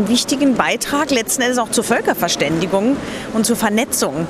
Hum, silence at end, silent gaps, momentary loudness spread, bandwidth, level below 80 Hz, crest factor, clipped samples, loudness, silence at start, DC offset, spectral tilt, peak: none; 0 s; none; 3 LU; 16 kHz; -48 dBFS; 16 dB; under 0.1%; -17 LUFS; 0 s; under 0.1%; -3 dB/octave; 0 dBFS